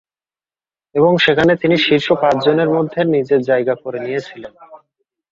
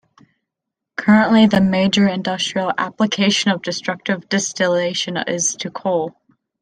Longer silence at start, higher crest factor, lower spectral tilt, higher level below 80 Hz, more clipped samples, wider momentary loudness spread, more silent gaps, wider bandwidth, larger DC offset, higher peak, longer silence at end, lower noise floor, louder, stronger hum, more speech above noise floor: about the same, 0.95 s vs 1 s; about the same, 16 dB vs 16 dB; first, -6.5 dB/octave vs -4 dB/octave; about the same, -54 dBFS vs -56 dBFS; neither; about the same, 11 LU vs 10 LU; neither; second, 7.6 kHz vs 10 kHz; neither; about the same, -2 dBFS vs -2 dBFS; about the same, 0.55 s vs 0.5 s; first, under -90 dBFS vs -82 dBFS; about the same, -15 LUFS vs -17 LUFS; neither; first, over 75 dB vs 65 dB